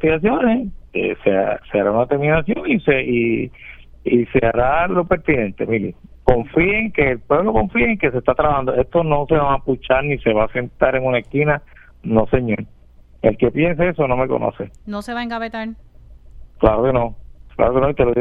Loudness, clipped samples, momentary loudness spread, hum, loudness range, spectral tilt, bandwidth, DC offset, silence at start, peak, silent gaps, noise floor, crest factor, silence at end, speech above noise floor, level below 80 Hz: -18 LUFS; under 0.1%; 9 LU; none; 4 LU; -9 dB/octave; 10.5 kHz; under 0.1%; 0 s; 0 dBFS; none; -43 dBFS; 18 dB; 0 s; 26 dB; -34 dBFS